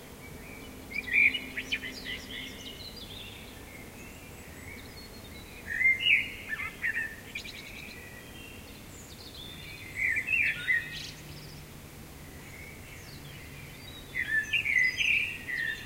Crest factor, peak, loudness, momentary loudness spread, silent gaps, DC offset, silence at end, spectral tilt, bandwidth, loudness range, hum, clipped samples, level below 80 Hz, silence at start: 22 dB; -12 dBFS; -28 LUFS; 21 LU; none; under 0.1%; 0 s; -2 dB/octave; 16 kHz; 12 LU; none; under 0.1%; -54 dBFS; 0 s